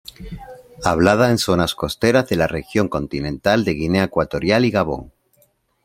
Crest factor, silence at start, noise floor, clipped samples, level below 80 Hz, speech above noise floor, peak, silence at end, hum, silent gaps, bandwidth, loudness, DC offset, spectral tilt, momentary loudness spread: 20 dB; 0.2 s; -60 dBFS; under 0.1%; -42 dBFS; 42 dB; 0 dBFS; 0.8 s; none; none; 16.5 kHz; -18 LUFS; under 0.1%; -5.5 dB/octave; 11 LU